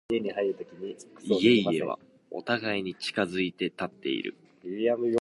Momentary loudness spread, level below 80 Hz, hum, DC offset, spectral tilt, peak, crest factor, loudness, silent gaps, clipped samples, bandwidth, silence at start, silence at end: 17 LU; -68 dBFS; none; under 0.1%; -5.5 dB/octave; -8 dBFS; 22 dB; -28 LUFS; none; under 0.1%; 11.5 kHz; 0.1 s; 0 s